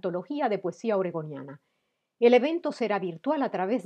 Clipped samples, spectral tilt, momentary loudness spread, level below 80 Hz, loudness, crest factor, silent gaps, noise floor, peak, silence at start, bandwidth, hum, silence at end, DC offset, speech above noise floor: under 0.1%; -6.5 dB/octave; 15 LU; under -90 dBFS; -27 LUFS; 20 dB; none; -78 dBFS; -8 dBFS; 0.05 s; 8.8 kHz; none; 0 s; under 0.1%; 51 dB